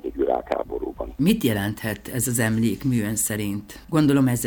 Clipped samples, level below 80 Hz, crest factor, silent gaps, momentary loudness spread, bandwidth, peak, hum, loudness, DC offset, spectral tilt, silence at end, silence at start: under 0.1%; -44 dBFS; 16 dB; none; 10 LU; over 20 kHz; -8 dBFS; none; -23 LUFS; under 0.1%; -5 dB/octave; 0 s; 0.05 s